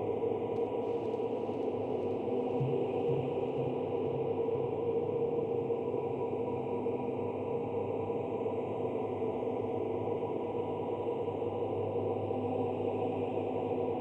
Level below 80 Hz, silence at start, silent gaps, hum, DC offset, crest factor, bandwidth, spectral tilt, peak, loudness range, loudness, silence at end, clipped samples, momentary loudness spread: -68 dBFS; 0 s; none; none; under 0.1%; 12 dB; 4.2 kHz; -9.5 dB/octave; -20 dBFS; 2 LU; -34 LUFS; 0 s; under 0.1%; 3 LU